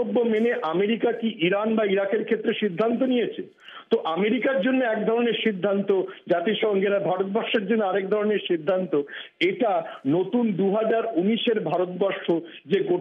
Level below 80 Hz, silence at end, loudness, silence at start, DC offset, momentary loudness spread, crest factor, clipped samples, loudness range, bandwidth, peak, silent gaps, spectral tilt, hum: -86 dBFS; 0 s; -24 LUFS; 0 s; under 0.1%; 4 LU; 14 dB; under 0.1%; 1 LU; 5.6 kHz; -10 dBFS; none; -8 dB/octave; none